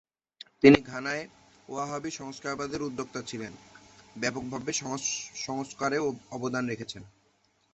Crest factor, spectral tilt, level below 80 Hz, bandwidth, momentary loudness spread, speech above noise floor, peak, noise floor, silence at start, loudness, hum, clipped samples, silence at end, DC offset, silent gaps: 28 dB; -4 dB/octave; -60 dBFS; 8.2 kHz; 19 LU; 40 dB; -2 dBFS; -69 dBFS; 0.6 s; -29 LUFS; none; under 0.1%; 0.65 s; under 0.1%; none